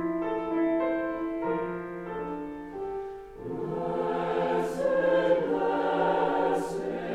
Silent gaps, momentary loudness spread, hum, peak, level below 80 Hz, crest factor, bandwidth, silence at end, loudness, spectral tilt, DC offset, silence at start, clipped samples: none; 12 LU; none; -12 dBFS; -56 dBFS; 16 dB; 13 kHz; 0 s; -29 LUFS; -6.5 dB/octave; under 0.1%; 0 s; under 0.1%